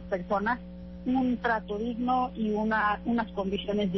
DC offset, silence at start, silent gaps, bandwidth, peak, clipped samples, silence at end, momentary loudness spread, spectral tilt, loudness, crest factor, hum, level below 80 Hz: under 0.1%; 0 s; none; 6 kHz; -16 dBFS; under 0.1%; 0 s; 6 LU; -7.5 dB/octave; -29 LUFS; 12 dB; 60 Hz at -45 dBFS; -48 dBFS